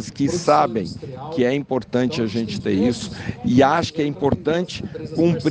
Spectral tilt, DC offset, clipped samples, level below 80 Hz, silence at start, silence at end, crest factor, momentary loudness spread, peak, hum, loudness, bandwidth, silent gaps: -6 dB/octave; under 0.1%; under 0.1%; -48 dBFS; 0 s; 0 s; 16 dB; 11 LU; -4 dBFS; none; -21 LUFS; 9.6 kHz; none